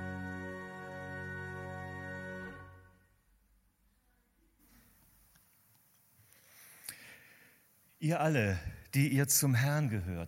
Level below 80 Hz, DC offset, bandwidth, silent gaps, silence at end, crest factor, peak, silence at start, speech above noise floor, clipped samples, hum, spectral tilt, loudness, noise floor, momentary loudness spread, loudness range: -62 dBFS; under 0.1%; 17 kHz; none; 0 s; 22 dB; -16 dBFS; 0 s; 42 dB; under 0.1%; none; -4.5 dB/octave; -34 LUFS; -72 dBFS; 24 LU; 22 LU